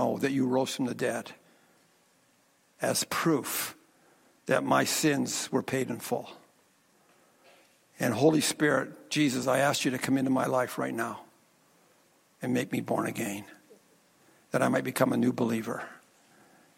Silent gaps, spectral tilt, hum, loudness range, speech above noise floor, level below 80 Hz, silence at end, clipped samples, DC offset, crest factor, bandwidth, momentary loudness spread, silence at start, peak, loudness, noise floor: none; -4.5 dB/octave; none; 6 LU; 38 dB; -74 dBFS; 0.8 s; under 0.1%; under 0.1%; 20 dB; 16.5 kHz; 11 LU; 0 s; -10 dBFS; -29 LUFS; -67 dBFS